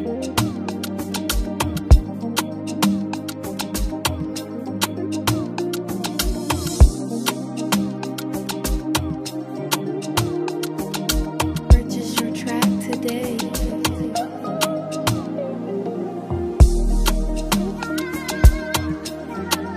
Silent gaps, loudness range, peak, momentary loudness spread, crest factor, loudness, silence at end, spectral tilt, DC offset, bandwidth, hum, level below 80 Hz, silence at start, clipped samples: none; 4 LU; 0 dBFS; 10 LU; 20 dB; -22 LUFS; 0 s; -5 dB/octave; under 0.1%; 15.5 kHz; none; -24 dBFS; 0 s; under 0.1%